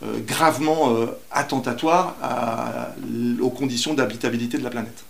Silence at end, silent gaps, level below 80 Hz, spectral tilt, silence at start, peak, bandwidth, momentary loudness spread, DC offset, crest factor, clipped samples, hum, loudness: 0.05 s; none; -62 dBFS; -4.5 dB/octave; 0 s; -2 dBFS; 16 kHz; 8 LU; 0.7%; 22 dB; under 0.1%; none; -23 LUFS